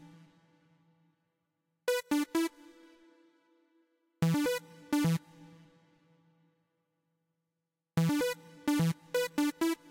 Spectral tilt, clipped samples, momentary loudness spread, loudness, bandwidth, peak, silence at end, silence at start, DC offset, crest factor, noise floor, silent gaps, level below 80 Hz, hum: -5.5 dB/octave; under 0.1%; 7 LU; -33 LUFS; 16.5 kHz; -20 dBFS; 0.15 s; 0 s; under 0.1%; 16 dB; -88 dBFS; none; -70 dBFS; none